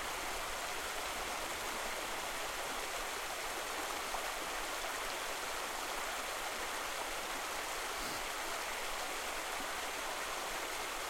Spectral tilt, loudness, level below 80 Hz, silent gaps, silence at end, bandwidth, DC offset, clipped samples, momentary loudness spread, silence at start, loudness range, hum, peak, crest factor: -0.5 dB/octave; -39 LUFS; -56 dBFS; none; 0 s; 16.5 kHz; under 0.1%; under 0.1%; 1 LU; 0 s; 0 LU; none; -26 dBFS; 14 dB